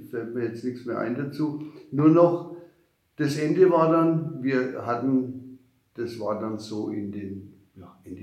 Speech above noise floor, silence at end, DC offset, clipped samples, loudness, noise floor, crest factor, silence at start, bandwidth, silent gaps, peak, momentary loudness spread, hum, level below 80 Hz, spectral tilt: 39 dB; 0 s; under 0.1%; under 0.1%; -25 LUFS; -63 dBFS; 20 dB; 0 s; 13 kHz; none; -6 dBFS; 19 LU; none; -74 dBFS; -8 dB/octave